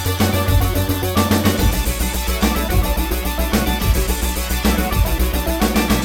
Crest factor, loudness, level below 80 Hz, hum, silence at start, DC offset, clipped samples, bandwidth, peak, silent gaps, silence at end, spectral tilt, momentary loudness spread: 14 dB; -18 LUFS; -22 dBFS; none; 0 s; under 0.1%; under 0.1%; 18 kHz; -2 dBFS; none; 0 s; -4.5 dB/octave; 4 LU